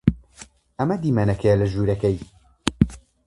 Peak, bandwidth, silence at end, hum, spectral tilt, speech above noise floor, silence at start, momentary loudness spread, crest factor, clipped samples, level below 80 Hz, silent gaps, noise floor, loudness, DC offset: 0 dBFS; 11.5 kHz; 0.3 s; none; -7.5 dB/octave; 27 dB; 0.05 s; 10 LU; 22 dB; under 0.1%; -38 dBFS; none; -48 dBFS; -22 LUFS; under 0.1%